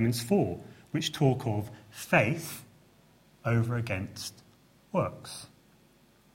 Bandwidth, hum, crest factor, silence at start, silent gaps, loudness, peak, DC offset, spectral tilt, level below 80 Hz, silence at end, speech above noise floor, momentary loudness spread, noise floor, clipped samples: 16.5 kHz; none; 24 dB; 0 s; none; -30 LUFS; -8 dBFS; under 0.1%; -5.5 dB/octave; -62 dBFS; 0.9 s; 32 dB; 17 LU; -62 dBFS; under 0.1%